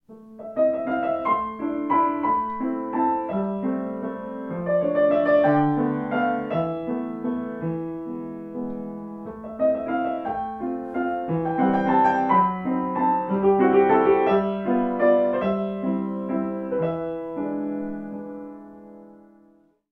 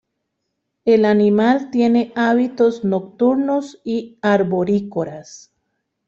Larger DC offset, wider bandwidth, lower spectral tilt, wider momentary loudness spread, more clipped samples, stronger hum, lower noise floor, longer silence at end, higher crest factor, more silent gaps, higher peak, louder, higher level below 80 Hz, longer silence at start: neither; second, 5.8 kHz vs 7.6 kHz; first, -9.5 dB/octave vs -7 dB/octave; first, 14 LU vs 11 LU; neither; neither; second, -58 dBFS vs -75 dBFS; about the same, 0.8 s vs 0.7 s; about the same, 16 dB vs 14 dB; neither; about the same, -6 dBFS vs -4 dBFS; second, -24 LUFS vs -17 LUFS; first, -56 dBFS vs -62 dBFS; second, 0.1 s vs 0.85 s